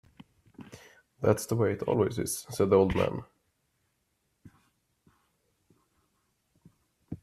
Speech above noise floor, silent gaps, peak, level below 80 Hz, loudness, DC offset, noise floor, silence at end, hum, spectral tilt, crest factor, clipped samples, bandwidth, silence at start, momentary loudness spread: 50 dB; none; -10 dBFS; -58 dBFS; -28 LUFS; under 0.1%; -77 dBFS; 0.05 s; none; -6 dB/octave; 22 dB; under 0.1%; 15 kHz; 0.6 s; 23 LU